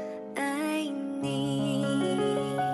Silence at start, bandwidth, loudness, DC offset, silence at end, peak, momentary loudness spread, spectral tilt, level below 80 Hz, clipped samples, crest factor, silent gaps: 0 s; 12 kHz; -30 LUFS; under 0.1%; 0 s; -16 dBFS; 5 LU; -5.5 dB/octave; -68 dBFS; under 0.1%; 12 dB; none